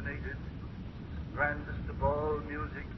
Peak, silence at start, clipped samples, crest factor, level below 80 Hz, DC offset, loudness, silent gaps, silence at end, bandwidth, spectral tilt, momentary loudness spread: -18 dBFS; 0 s; under 0.1%; 18 dB; -44 dBFS; under 0.1%; -36 LUFS; none; 0 s; 6 kHz; -6 dB/octave; 12 LU